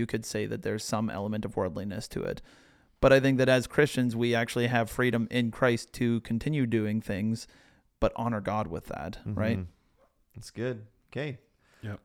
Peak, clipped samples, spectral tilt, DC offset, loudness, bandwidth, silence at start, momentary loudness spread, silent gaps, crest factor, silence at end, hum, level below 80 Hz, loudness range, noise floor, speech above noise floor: -8 dBFS; under 0.1%; -6 dB/octave; under 0.1%; -29 LUFS; 16.5 kHz; 0 s; 14 LU; none; 22 dB; 0.1 s; none; -50 dBFS; 9 LU; -67 dBFS; 38 dB